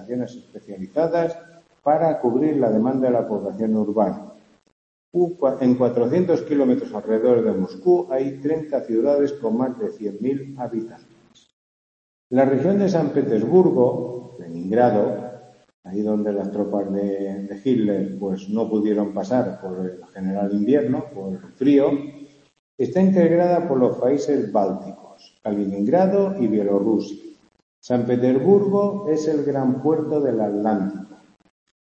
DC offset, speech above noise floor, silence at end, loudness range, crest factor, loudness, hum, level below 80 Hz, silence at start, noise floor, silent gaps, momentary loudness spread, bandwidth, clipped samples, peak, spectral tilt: under 0.1%; over 70 dB; 0.85 s; 4 LU; 18 dB; -21 LUFS; none; -64 dBFS; 0 s; under -90 dBFS; 4.72-5.12 s, 11.53-12.30 s, 15.74-15.83 s, 22.59-22.78 s, 27.62-27.82 s; 12 LU; 8 kHz; under 0.1%; -4 dBFS; -8.5 dB/octave